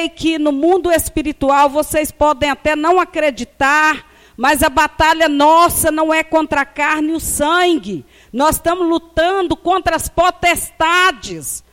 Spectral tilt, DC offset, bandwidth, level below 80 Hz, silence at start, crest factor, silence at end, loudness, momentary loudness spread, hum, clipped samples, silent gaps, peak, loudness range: -3 dB/octave; under 0.1%; 16.5 kHz; -36 dBFS; 0 s; 12 dB; 0.15 s; -14 LUFS; 6 LU; none; under 0.1%; none; -2 dBFS; 3 LU